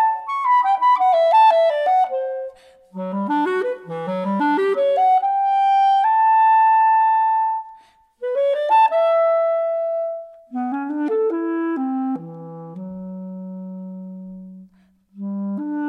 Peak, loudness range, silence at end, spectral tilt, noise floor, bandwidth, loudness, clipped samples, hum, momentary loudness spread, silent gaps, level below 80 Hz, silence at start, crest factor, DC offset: -6 dBFS; 12 LU; 0 s; -7 dB/octave; -55 dBFS; 9.4 kHz; -18 LUFS; under 0.1%; none; 19 LU; none; -72 dBFS; 0 s; 14 dB; under 0.1%